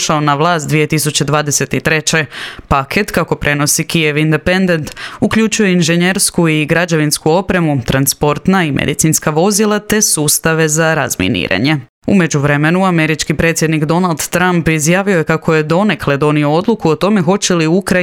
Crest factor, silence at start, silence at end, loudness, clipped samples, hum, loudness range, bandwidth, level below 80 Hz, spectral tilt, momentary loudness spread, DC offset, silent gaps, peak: 12 dB; 0 s; 0 s; -12 LUFS; under 0.1%; none; 2 LU; 17.5 kHz; -38 dBFS; -4.5 dB/octave; 3 LU; under 0.1%; 11.89-12.02 s; 0 dBFS